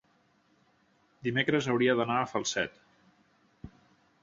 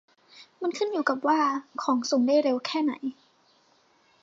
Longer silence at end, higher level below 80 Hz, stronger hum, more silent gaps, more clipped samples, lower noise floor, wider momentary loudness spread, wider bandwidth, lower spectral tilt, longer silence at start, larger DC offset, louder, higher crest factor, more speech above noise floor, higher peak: second, 0.55 s vs 1.1 s; first, -66 dBFS vs -84 dBFS; neither; neither; neither; first, -68 dBFS vs -64 dBFS; first, 26 LU vs 10 LU; about the same, 7.8 kHz vs 7.8 kHz; first, -4.5 dB/octave vs -3 dB/octave; first, 1.25 s vs 0.35 s; neither; second, -29 LUFS vs -26 LUFS; about the same, 22 dB vs 18 dB; about the same, 40 dB vs 38 dB; about the same, -12 dBFS vs -10 dBFS